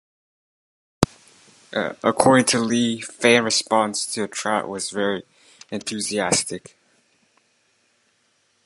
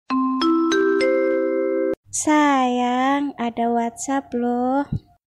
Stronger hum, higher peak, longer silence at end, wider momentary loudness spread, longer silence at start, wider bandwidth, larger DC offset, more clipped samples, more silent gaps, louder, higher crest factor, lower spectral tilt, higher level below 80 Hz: neither; first, 0 dBFS vs -6 dBFS; first, 2.1 s vs 0.35 s; first, 13 LU vs 6 LU; first, 1 s vs 0.1 s; first, 16 kHz vs 12.5 kHz; neither; neither; second, none vs 1.97-2.03 s; about the same, -21 LUFS vs -20 LUFS; first, 24 dB vs 14 dB; about the same, -3 dB/octave vs -4 dB/octave; about the same, -52 dBFS vs -52 dBFS